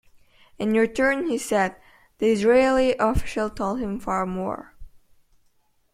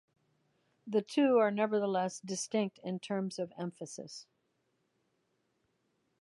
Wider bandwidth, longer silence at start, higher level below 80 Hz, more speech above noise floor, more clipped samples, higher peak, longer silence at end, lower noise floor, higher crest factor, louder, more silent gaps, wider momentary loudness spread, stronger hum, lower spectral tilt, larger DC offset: first, 15.5 kHz vs 11.5 kHz; second, 0.6 s vs 0.85 s; first, -42 dBFS vs -86 dBFS; second, 42 dB vs 46 dB; neither; first, -6 dBFS vs -16 dBFS; second, 1.05 s vs 2 s; second, -64 dBFS vs -79 dBFS; about the same, 18 dB vs 20 dB; first, -23 LUFS vs -33 LUFS; neither; second, 10 LU vs 17 LU; neither; about the same, -5.5 dB/octave vs -5 dB/octave; neither